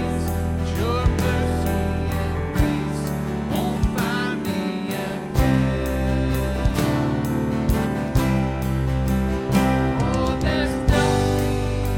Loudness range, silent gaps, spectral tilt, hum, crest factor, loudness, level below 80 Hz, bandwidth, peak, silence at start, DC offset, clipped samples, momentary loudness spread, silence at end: 2 LU; none; -6.5 dB/octave; none; 16 dB; -22 LUFS; -28 dBFS; 17 kHz; -4 dBFS; 0 s; under 0.1%; under 0.1%; 5 LU; 0 s